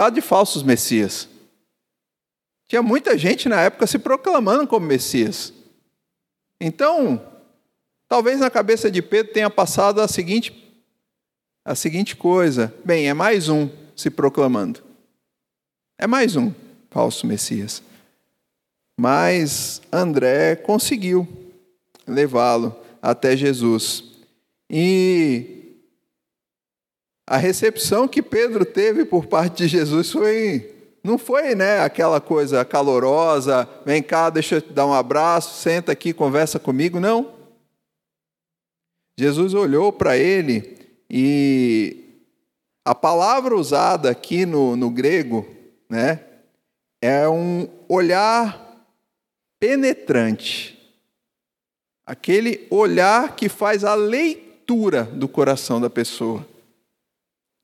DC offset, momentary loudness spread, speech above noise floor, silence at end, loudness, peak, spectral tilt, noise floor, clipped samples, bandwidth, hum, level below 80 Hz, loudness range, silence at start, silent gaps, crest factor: under 0.1%; 9 LU; over 72 dB; 1.2 s; -19 LUFS; 0 dBFS; -5 dB/octave; under -90 dBFS; under 0.1%; 16 kHz; none; -64 dBFS; 4 LU; 0 s; none; 18 dB